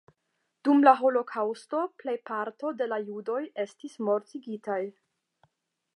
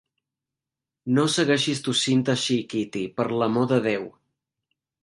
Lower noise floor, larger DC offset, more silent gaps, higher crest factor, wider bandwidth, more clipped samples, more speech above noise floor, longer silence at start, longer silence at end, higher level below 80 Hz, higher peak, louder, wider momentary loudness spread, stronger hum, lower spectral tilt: second, -79 dBFS vs -88 dBFS; neither; neither; first, 24 dB vs 18 dB; about the same, 11 kHz vs 11.5 kHz; neither; second, 51 dB vs 65 dB; second, 0.65 s vs 1.05 s; about the same, 1.05 s vs 0.95 s; second, -88 dBFS vs -66 dBFS; about the same, -4 dBFS vs -6 dBFS; second, -28 LUFS vs -23 LUFS; first, 15 LU vs 9 LU; neither; first, -6 dB/octave vs -4.5 dB/octave